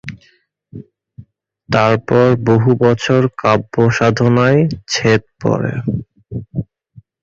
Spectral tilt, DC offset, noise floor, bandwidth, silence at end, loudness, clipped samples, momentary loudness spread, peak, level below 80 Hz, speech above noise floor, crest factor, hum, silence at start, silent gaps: -6.5 dB/octave; under 0.1%; -55 dBFS; 7.6 kHz; 0.6 s; -14 LUFS; under 0.1%; 14 LU; 0 dBFS; -44 dBFS; 42 dB; 14 dB; none; 0.05 s; none